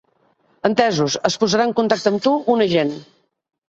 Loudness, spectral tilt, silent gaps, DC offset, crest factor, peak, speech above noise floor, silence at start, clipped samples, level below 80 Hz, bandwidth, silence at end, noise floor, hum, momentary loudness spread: -18 LUFS; -4.5 dB/octave; none; under 0.1%; 20 dB; 0 dBFS; 43 dB; 0.65 s; under 0.1%; -60 dBFS; 8 kHz; 0.65 s; -61 dBFS; none; 5 LU